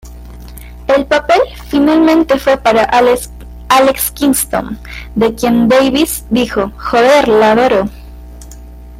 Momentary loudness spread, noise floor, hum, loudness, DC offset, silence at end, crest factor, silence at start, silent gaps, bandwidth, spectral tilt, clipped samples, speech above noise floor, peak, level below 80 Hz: 12 LU; -31 dBFS; none; -11 LUFS; under 0.1%; 0 s; 12 dB; 0.05 s; none; 16.5 kHz; -4 dB/octave; under 0.1%; 21 dB; 0 dBFS; -32 dBFS